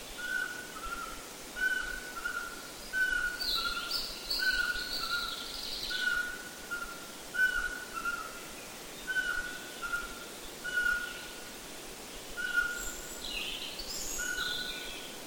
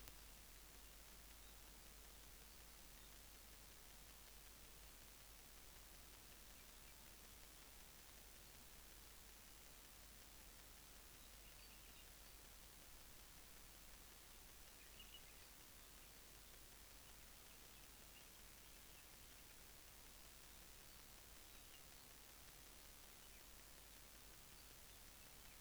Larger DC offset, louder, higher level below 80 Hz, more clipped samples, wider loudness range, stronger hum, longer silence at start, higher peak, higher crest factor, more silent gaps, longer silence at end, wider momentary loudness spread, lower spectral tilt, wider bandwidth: first, 0.1% vs under 0.1%; first, -34 LUFS vs -61 LUFS; first, -54 dBFS vs -68 dBFS; neither; first, 4 LU vs 0 LU; neither; about the same, 0 s vs 0 s; first, -18 dBFS vs -30 dBFS; second, 18 dB vs 32 dB; neither; about the same, 0 s vs 0 s; first, 12 LU vs 0 LU; second, -0.5 dB/octave vs -2 dB/octave; second, 17 kHz vs over 20 kHz